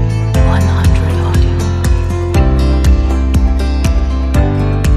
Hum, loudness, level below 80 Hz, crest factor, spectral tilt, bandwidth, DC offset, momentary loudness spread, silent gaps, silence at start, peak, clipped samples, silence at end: none; -13 LUFS; -14 dBFS; 10 dB; -7 dB/octave; 14.5 kHz; under 0.1%; 3 LU; none; 0 s; 0 dBFS; under 0.1%; 0 s